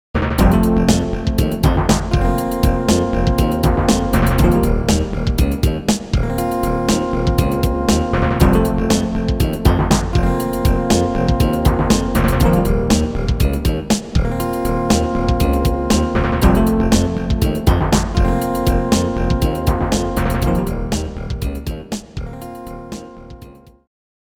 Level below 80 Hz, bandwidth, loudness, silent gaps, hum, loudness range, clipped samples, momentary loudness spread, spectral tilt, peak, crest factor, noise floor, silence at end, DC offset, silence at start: -22 dBFS; 20 kHz; -17 LUFS; none; none; 4 LU; under 0.1%; 8 LU; -6 dB/octave; 0 dBFS; 16 dB; -40 dBFS; 0.8 s; under 0.1%; 0.15 s